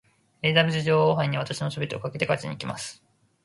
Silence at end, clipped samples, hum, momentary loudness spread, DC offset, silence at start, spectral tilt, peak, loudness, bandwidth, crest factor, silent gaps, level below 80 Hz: 0.5 s; under 0.1%; none; 12 LU; under 0.1%; 0.45 s; -5.5 dB/octave; -6 dBFS; -25 LUFS; 11.5 kHz; 20 dB; none; -62 dBFS